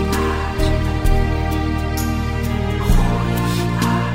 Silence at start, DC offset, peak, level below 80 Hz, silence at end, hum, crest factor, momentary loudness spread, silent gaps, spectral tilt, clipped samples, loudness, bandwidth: 0 s; under 0.1%; -2 dBFS; -22 dBFS; 0 s; none; 14 dB; 3 LU; none; -6 dB/octave; under 0.1%; -20 LUFS; 16.5 kHz